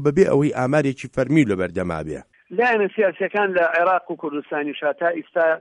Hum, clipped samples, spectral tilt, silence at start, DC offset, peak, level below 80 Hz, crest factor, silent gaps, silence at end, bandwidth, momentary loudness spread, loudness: none; under 0.1%; -7 dB/octave; 0 s; under 0.1%; -2 dBFS; -52 dBFS; 18 dB; none; 0 s; 10.5 kHz; 10 LU; -21 LUFS